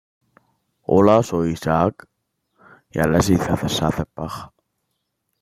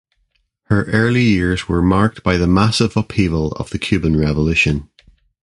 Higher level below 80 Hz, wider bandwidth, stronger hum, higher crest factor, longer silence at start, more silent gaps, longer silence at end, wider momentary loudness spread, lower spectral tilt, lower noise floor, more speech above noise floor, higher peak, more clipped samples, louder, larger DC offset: second, -44 dBFS vs -30 dBFS; first, 16 kHz vs 11.5 kHz; neither; about the same, 20 dB vs 16 dB; first, 0.9 s vs 0.7 s; neither; first, 0.95 s vs 0.6 s; first, 16 LU vs 6 LU; about the same, -6 dB/octave vs -6.5 dB/octave; first, -75 dBFS vs -65 dBFS; first, 56 dB vs 50 dB; about the same, -2 dBFS vs 0 dBFS; neither; second, -19 LUFS vs -16 LUFS; neither